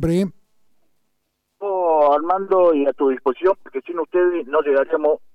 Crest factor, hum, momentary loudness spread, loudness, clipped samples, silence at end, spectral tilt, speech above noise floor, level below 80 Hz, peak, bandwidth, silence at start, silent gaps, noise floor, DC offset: 14 dB; none; 10 LU; -19 LUFS; under 0.1%; 0.15 s; -8 dB/octave; 53 dB; -48 dBFS; -6 dBFS; 11 kHz; 0 s; none; -71 dBFS; under 0.1%